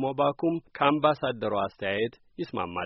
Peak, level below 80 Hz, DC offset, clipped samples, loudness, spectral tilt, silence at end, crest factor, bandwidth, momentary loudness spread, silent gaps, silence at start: -8 dBFS; -64 dBFS; under 0.1%; under 0.1%; -28 LUFS; -4 dB/octave; 0 s; 20 dB; 5.8 kHz; 10 LU; none; 0 s